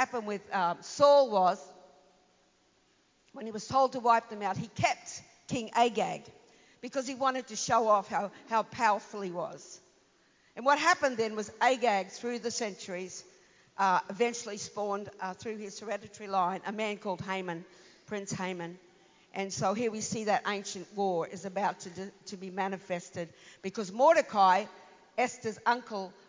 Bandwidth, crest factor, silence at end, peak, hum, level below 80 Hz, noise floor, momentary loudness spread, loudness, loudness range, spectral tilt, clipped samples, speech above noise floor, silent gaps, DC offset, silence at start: 7.6 kHz; 22 dB; 0.15 s; -10 dBFS; none; -72 dBFS; -69 dBFS; 16 LU; -31 LUFS; 6 LU; -3.5 dB/octave; under 0.1%; 38 dB; none; under 0.1%; 0 s